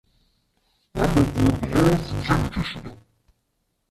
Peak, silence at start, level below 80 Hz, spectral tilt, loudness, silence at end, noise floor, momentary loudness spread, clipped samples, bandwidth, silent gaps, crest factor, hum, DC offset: -4 dBFS; 0.95 s; -36 dBFS; -6.5 dB/octave; -22 LUFS; 0.95 s; -73 dBFS; 15 LU; under 0.1%; 14.5 kHz; none; 20 dB; none; under 0.1%